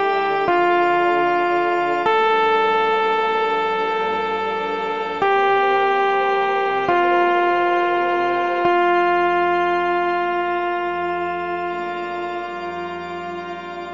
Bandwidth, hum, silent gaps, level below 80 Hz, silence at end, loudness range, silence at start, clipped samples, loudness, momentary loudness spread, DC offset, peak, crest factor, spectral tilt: 7.4 kHz; none; none; -64 dBFS; 0 s; 5 LU; 0 s; under 0.1%; -19 LUFS; 10 LU; 0.3%; -6 dBFS; 14 dB; -5.5 dB/octave